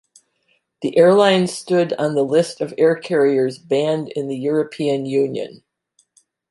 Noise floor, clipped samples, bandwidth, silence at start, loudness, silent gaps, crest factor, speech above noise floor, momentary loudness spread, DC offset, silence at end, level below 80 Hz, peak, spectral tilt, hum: -65 dBFS; under 0.1%; 11.5 kHz; 0.8 s; -18 LUFS; none; 16 dB; 48 dB; 10 LU; under 0.1%; 1 s; -68 dBFS; -2 dBFS; -5.5 dB/octave; none